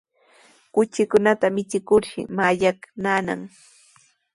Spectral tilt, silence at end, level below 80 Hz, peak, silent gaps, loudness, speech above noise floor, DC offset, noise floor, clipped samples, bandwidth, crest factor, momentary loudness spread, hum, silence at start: -5.5 dB/octave; 0.85 s; -60 dBFS; -4 dBFS; none; -22 LUFS; 37 dB; under 0.1%; -58 dBFS; under 0.1%; 11.5 kHz; 20 dB; 11 LU; none; 0.75 s